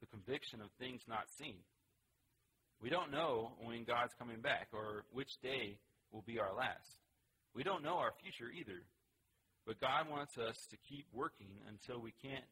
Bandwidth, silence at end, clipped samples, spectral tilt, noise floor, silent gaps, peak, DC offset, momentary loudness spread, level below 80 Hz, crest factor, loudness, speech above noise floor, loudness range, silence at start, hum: 16 kHz; 0.05 s; under 0.1%; -4.5 dB/octave; -82 dBFS; none; -24 dBFS; under 0.1%; 16 LU; -76 dBFS; 22 dB; -44 LUFS; 37 dB; 3 LU; 0 s; none